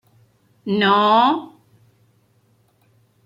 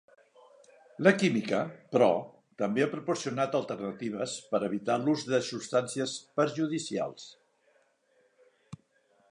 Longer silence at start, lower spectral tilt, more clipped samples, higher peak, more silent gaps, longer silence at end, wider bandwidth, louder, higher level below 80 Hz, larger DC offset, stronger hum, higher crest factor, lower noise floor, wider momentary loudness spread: second, 0.65 s vs 1 s; first, -6.5 dB/octave vs -5 dB/octave; neither; first, -4 dBFS vs -8 dBFS; neither; first, 1.8 s vs 0.55 s; first, 14 kHz vs 11.5 kHz; first, -17 LUFS vs -30 LUFS; first, -70 dBFS vs -76 dBFS; neither; neither; second, 18 dB vs 24 dB; second, -60 dBFS vs -69 dBFS; second, 12 LU vs 23 LU